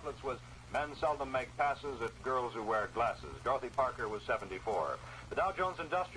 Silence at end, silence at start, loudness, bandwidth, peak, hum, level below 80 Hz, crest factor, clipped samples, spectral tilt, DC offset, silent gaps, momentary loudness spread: 0 s; 0 s; -37 LUFS; 11 kHz; -20 dBFS; none; -56 dBFS; 16 dB; under 0.1%; -5 dB/octave; under 0.1%; none; 6 LU